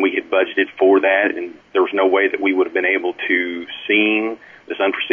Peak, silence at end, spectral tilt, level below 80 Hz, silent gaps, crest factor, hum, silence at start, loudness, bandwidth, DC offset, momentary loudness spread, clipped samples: -4 dBFS; 0 s; -6 dB/octave; -66 dBFS; none; 14 dB; none; 0 s; -17 LUFS; 3.6 kHz; under 0.1%; 11 LU; under 0.1%